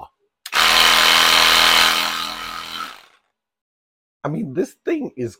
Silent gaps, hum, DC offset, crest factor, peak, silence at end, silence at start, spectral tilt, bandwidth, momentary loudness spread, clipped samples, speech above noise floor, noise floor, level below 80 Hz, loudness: 3.61-4.20 s; none; under 0.1%; 18 dB; -2 dBFS; 0.1 s; 0 s; -1 dB/octave; 17 kHz; 18 LU; under 0.1%; 39 dB; -63 dBFS; -48 dBFS; -14 LUFS